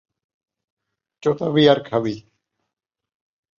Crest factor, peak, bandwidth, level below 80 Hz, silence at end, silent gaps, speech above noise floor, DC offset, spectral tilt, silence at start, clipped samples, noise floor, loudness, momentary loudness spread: 22 dB; -2 dBFS; 7.2 kHz; -62 dBFS; 1.4 s; none; 63 dB; under 0.1%; -7 dB/octave; 1.25 s; under 0.1%; -81 dBFS; -19 LUFS; 12 LU